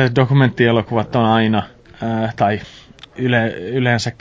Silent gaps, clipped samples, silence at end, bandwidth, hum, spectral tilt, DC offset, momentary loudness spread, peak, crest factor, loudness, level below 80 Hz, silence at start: none; under 0.1%; 0.1 s; 7.8 kHz; none; -7 dB/octave; under 0.1%; 10 LU; -2 dBFS; 16 dB; -17 LUFS; -46 dBFS; 0 s